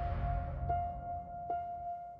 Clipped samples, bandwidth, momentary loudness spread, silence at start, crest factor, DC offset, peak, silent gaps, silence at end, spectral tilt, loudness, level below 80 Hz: under 0.1%; 5.2 kHz; 6 LU; 0 s; 16 dB; under 0.1%; -22 dBFS; none; 0 s; -10 dB/octave; -39 LUFS; -44 dBFS